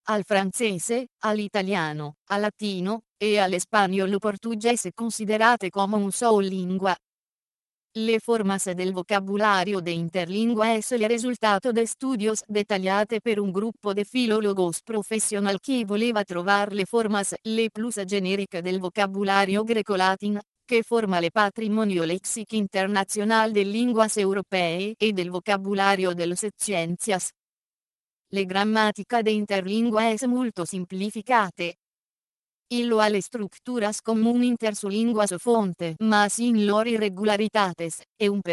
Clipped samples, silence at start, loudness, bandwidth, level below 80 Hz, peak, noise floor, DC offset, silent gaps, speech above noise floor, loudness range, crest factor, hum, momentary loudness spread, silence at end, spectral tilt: under 0.1%; 0.05 s; -24 LUFS; 12.5 kHz; -70 dBFS; -6 dBFS; under -90 dBFS; under 0.1%; 1.12-1.18 s, 2.18-2.26 s, 3.09-3.16 s, 7.04-7.90 s, 20.48-20.54 s, 27.39-28.25 s, 31.79-32.65 s, 38.09-38.16 s; over 66 dB; 3 LU; 18 dB; none; 7 LU; 0 s; -4 dB/octave